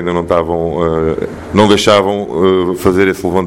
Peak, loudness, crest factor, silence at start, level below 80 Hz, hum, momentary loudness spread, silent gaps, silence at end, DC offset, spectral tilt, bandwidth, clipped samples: 0 dBFS; -12 LUFS; 12 dB; 0 s; -36 dBFS; none; 7 LU; none; 0 s; under 0.1%; -5.5 dB/octave; 17 kHz; 0.1%